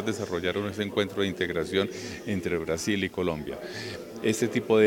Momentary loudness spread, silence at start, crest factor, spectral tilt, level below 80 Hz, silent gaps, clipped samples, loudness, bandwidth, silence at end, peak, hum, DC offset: 9 LU; 0 s; 20 dB; -5 dB/octave; -60 dBFS; none; under 0.1%; -29 LUFS; 17.5 kHz; 0 s; -8 dBFS; none; under 0.1%